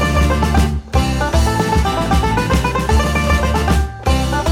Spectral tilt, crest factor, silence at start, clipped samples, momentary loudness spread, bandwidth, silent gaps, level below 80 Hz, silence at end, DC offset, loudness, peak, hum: -5.5 dB/octave; 12 dB; 0 s; under 0.1%; 3 LU; 16 kHz; none; -18 dBFS; 0 s; under 0.1%; -16 LUFS; -2 dBFS; none